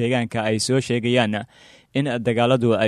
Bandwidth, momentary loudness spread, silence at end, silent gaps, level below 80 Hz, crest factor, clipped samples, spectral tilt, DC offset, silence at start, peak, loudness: 13 kHz; 9 LU; 0 s; none; -56 dBFS; 16 dB; under 0.1%; -5.5 dB/octave; under 0.1%; 0 s; -4 dBFS; -21 LUFS